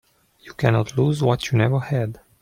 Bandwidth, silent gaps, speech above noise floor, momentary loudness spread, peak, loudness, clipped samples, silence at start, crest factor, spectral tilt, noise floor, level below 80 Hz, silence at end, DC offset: 14.5 kHz; none; 27 dB; 7 LU; -4 dBFS; -21 LUFS; under 0.1%; 0.45 s; 18 dB; -7 dB/octave; -47 dBFS; -52 dBFS; 0.25 s; under 0.1%